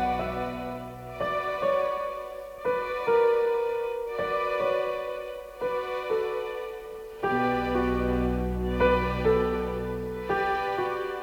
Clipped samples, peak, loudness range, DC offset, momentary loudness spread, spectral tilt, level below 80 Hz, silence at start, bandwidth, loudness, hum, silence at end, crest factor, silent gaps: under 0.1%; -10 dBFS; 3 LU; under 0.1%; 12 LU; -7 dB/octave; -42 dBFS; 0 s; 18.5 kHz; -28 LUFS; none; 0 s; 18 dB; none